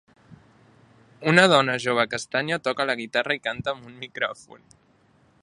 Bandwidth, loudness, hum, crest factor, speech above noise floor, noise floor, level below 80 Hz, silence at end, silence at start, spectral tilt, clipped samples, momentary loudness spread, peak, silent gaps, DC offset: 11.5 kHz; -23 LUFS; none; 26 dB; 37 dB; -60 dBFS; -66 dBFS; 0.85 s; 0.3 s; -4 dB/octave; under 0.1%; 14 LU; 0 dBFS; none; under 0.1%